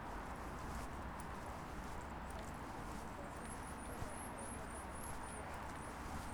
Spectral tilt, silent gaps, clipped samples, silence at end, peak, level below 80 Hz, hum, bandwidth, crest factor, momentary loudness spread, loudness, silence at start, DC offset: -4.5 dB/octave; none; under 0.1%; 0 s; -32 dBFS; -54 dBFS; none; over 20 kHz; 16 dB; 1 LU; -48 LUFS; 0 s; under 0.1%